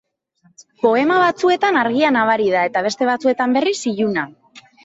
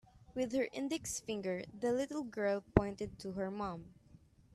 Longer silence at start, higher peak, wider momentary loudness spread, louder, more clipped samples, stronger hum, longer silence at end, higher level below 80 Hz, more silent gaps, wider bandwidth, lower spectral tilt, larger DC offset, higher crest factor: first, 0.85 s vs 0.15 s; first, -4 dBFS vs -8 dBFS; second, 5 LU vs 9 LU; first, -17 LUFS vs -38 LUFS; neither; neither; second, 0.25 s vs 0.4 s; second, -64 dBFS vs -54 dBFS; neither; second, 8 kHz vs 13.5 kHz; about the same, -4.5 dB/octave vs -5.5 dB/octave; neither; second, 14 dB vs 30 dB